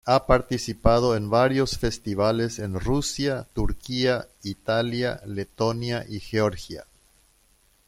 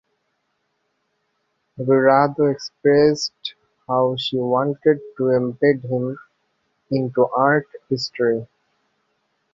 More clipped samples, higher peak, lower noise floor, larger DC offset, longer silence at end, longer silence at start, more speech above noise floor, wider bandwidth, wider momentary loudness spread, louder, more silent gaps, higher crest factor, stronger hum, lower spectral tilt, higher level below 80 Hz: neither; about the same, -2 dBFS vs -2 dBFS; second, -62 dBFS vs -72 dBFS; neither; about the same, 1.05 s vs 1.1 s; second, 0.05 s vs 1.8 s; second, 38 dB vs 53 dB; first, 16 kHz vs 7.6 kHz; about the same, 11 LU vs 11 LU; second, -25 LUFS vs -20 LUFS; neither; about the same, 22 dB vs 20 dB; neither; about the same, -5.5 dB/octave vs -6 dB/octave; first, -38 dBFS vs -62 dBFS